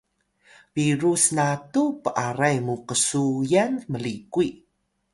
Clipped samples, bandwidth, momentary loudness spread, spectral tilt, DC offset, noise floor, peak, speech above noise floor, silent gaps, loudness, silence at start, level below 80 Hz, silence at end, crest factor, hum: under 0.1%; 11.5 kHz; 9 LU; -4.5 dB/octave; under 0.1%; -60 dBFS; -4 dBFS; 37 dB; none; -23 LUFS; 0.75 s; -62 dBFS; 0.6 s; 20 dB; none